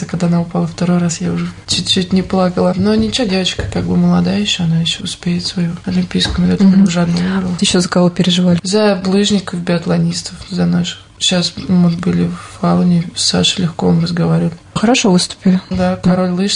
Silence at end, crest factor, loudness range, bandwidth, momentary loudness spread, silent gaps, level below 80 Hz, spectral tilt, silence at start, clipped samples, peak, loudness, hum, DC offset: 0 s; 12 dB; 3 LU; 10.5 kHz; 6 LU; none; -38 dBFS; -5 dB/octave; 0 s; under 0.1%; -2 dBFS; -14 LUFS; none; under 0.1%